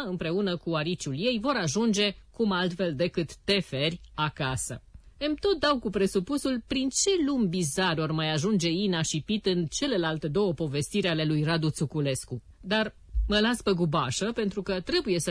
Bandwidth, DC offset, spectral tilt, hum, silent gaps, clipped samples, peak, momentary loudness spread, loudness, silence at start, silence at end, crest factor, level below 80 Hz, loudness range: 11 kHz; under 0.1%; -4.5 dB/octave; none; none; under 0.1%; -12 dBFS; 6 LU; -28 LUFS; 0 s; 0 s; 14 dB; -44 dBFS; 2 LU